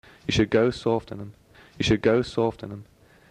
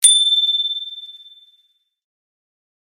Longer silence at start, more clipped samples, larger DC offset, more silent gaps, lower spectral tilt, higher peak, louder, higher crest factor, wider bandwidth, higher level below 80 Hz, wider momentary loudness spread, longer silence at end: first, 0.3 s vs 0 s; neither; neither; neither; first, -6 dB/octave vs 7.5 dB/octave; second, -8 dBFS vs 0 dBFS; second, -24 LUFS vs -14 LUFS; about the same, 18 dB vs 20 dB; second, 11 kHz vs 16.5 kHz; first, -48 dBFS vs -80 dBFS; second, 18 LU vs 22 LU; second, 0.5 s vs 1.75 s